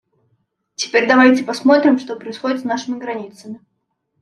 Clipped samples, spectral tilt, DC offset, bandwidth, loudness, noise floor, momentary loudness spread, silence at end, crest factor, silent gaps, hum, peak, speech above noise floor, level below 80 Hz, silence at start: under 0.1%; -3.5 dB/octave; under 0.1%; 10.5 kHz; -16 LUFS; -71 dBFS; 24 LU; 0.65 s; 16 dB; none; none; -2 dBFS; 55 dB; -68 dBFS; 0.8 s